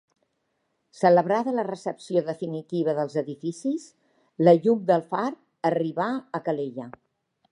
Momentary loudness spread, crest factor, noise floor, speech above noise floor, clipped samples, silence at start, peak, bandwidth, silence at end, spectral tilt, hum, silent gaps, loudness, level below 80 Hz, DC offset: 13 LU; 20 dB; -75 dBFS; 51 dB; under 0.1%; 0.95 s; -4 dBFS; 10.5 kHz; 0.6 s; -7.5 dB/octave; none; none; -25 LUFS; -78 dBFS; under 0.1%